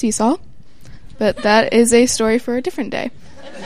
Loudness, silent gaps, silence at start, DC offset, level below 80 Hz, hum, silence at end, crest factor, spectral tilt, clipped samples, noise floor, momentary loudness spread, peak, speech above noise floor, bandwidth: -16 LUFS; none; 0.05 s; 2%; -44 dBFS; none; 0 s; 16 dB; -3.5 dB/octave; under 0.1%; -41 dBFS; 12 LU; 0 dBFS; 26 dB; 15 kHz